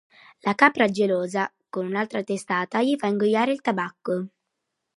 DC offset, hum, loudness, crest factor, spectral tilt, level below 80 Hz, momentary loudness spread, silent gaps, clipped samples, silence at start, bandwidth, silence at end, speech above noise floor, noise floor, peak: under 0.1%; none; -24 LUFS; 22 dB; -5.5 dB/octave; -74 dBFS; 11 LU; none; under 0.1%; 0.45 s; 11.5 kHz; 0.7 s; 57 dB; -80 dBFS; -2 dBFS